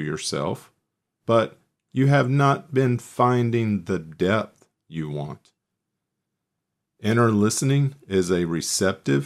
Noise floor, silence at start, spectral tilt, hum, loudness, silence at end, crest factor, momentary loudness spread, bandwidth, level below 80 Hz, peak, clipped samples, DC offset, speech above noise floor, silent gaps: -81 dBFS; 0 s; -5.5 dB/octave; none; -23 LUFS; 0 s; 18 dB; 12 LU; 14 kHz; -60 dBFS; -6 dBFS; under 0.1%; under 0.1%; 59 dB; none